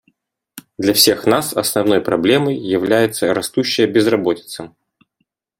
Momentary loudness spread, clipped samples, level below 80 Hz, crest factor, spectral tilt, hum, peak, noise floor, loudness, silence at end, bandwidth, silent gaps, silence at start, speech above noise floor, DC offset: 9 LU; under 0.1%; -56 dBFS; 18 dB; -3.5 dB/octave; none; 0 dBFS; -71 dBFS; -16 LUFS; 0.9 s; 16.5 kHz; none; 0.55 s; 55 dB; under 0.1%